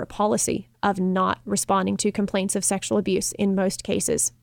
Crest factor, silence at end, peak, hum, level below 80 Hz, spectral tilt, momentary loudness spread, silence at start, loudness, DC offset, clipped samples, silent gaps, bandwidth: 16 dB; 0.15 s; -8 dBFS; none; -52 dBFS; -4 dB/octave; 3 LU; 0 s; -23 LUFS; under 0.1%; under 0.1%; none; 19 kHz